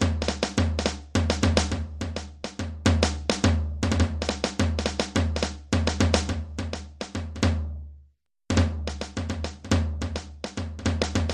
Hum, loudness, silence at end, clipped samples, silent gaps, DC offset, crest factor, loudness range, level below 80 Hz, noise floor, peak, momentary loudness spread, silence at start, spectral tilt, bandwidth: none; -27 LUFS; 0 s; under 0.1%; none; under 0.1%; 22 dB; 4 LU; -32 dBFS; -59 dBFS; -4 dBFS; 11 LU; 0 s; -5 dB/octave; 11 kHz